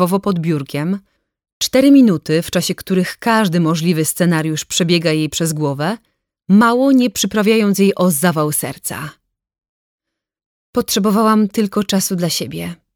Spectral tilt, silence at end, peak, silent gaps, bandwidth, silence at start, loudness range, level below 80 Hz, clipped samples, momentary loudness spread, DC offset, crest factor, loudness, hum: -5 dB/octave; 0.2 s; -2 dBFS; 1.52-1.61 s, 9.69-9.98 s, 10.46-10.73 s; 20 kHz; 0 s; 5 LU; -54 dBFS; under 0.1%; 11 LU; under 0.1%; 14 dB; -15 LUFS; none